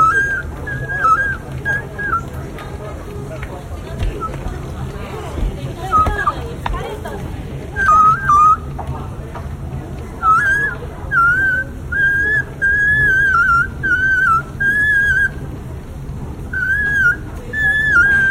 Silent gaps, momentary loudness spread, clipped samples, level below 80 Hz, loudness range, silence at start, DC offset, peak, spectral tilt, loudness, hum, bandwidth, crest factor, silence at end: none; 17 LU; under 0.1%; -30 dBFS; 10 LU; 0 s; under 0.1%; -2 dBFS; -5 dB/octave; -15 LUFS; none; 16 kHz; 14 dB; 0 s